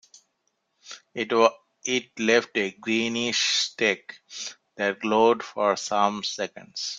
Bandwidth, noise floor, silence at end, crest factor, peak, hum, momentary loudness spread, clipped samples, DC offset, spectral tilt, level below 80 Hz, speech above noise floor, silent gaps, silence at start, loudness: 9.4 kHz; -75 dBFS; 0 s; 22 dB; -4 dBFS; none; 14 LU; under 0.1%; under 0.1%; -2.5 dB/octave; -72 dBFS; 50 dB; none; 0.85 s; -24 LUFS